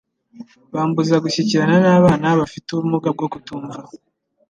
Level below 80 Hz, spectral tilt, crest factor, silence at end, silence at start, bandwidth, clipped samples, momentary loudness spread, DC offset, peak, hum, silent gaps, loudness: -52 dBFS; -6.5 dB/octave; 16 dB; 0.55 s; 0.35 s; 9 kHz; under 0.1%; 17 LU; under 0.1%; -2 dBFS; none; none; -17 LUFS